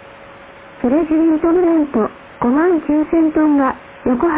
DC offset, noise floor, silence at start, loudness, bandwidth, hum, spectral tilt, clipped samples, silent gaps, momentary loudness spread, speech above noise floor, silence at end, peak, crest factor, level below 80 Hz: under 0.1%; -38 dBFS; 0.2 s; -15 LUFS; 3.8 kHz; none; -11 dB/octave; under 0.1%; none; 7 LU; 24 dB; 0 s; -4 dBFS; 12 dB; -44 dBFS